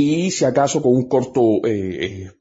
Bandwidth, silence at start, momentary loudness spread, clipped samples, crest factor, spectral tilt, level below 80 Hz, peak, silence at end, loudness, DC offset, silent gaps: 8 kHz; 0 s; 8 LU; under 0.1%; 14 dB; -5.5 dB/octave; -54 dBFS; -4 dBFS; 0.1 s; -18 LUFS; under 0.1%; none